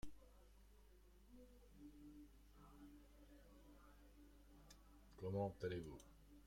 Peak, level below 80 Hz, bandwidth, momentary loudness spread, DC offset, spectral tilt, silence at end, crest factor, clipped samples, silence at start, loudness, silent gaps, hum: -34 dBFS; -68 dBFS; 16 kHz; 22 LU; under 0.1%; -7 dB/octave; 0 s; 20 dB; under 0.1%; 0 s; -52 LUFS; none; 50 Hz at -70 dBFS